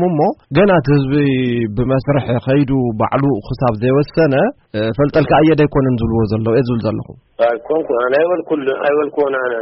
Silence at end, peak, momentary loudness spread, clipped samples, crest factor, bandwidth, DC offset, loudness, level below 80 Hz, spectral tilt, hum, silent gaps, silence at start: 0 s; -2 dBFS; 6 LU; under 0.1%; 12 dB; 5.8 kHz; under 0.1%; -15 LUFS; -38 dBFS; -6.5 dB/octave; none; none; 0 s